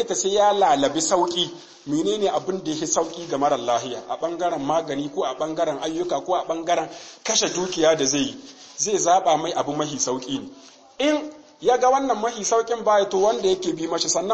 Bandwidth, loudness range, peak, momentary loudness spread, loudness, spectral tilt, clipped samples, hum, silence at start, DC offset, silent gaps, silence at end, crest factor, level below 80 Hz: 8.8 kHz; 3 LU; -6 dBFS; 9 LU; -22 LUFS; -2.5 dB/octave; under 0.1%; none; 0 s; under 0.1%; none; 0 s; 16 dB; -58 dBFS